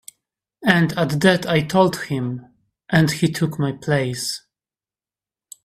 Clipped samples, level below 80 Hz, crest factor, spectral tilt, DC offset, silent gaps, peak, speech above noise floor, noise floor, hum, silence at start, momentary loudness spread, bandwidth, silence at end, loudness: under 0.1%; -54 dBFS; 20 dB; -5.5 dB/octave; under 0.1%; none; 0 dBFS; over 71 dB; under -90 dBFS; none; 0.6 s; 9 LU; 15 kHz; 1.25 s; -20 LUFS